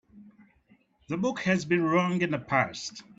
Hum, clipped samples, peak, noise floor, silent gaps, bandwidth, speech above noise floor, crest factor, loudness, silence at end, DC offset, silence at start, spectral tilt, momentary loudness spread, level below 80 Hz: none; under 0.1%; -10 dBFS; -64 dBFS; none; 7.8 kHz; 37 dB; 20 dB; -27 LUFS; 0.15 s; under 0.1%; 0.15 s; -5.5 dB/octave; 7 LU; -66 dBFS